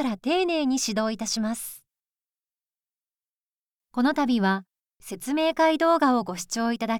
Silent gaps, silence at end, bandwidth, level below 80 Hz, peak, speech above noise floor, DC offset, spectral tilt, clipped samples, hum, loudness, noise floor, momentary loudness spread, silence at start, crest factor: 3.29-3.80 s; 0 s; 18 kHz; -62 dBFS; -10 dBFS; over 66 dB; under 0.1%; -4 dB/octave; under 0.1%; none; -24 LUFS; under -90 dBFS; 11 LU; 0 s; 16 dB